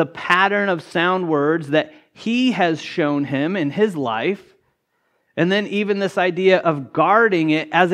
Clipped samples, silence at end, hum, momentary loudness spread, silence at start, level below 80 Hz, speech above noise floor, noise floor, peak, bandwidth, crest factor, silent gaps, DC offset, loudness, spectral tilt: under 0.1%; 0 s; none; 7 LU; 0 s; -70 dBFS; 50 dB; -68 dBFS; 0 dBFS; 11.5 kHz; 18 dB; none; under 0.1%; -18 LUFS; -6 dB/octave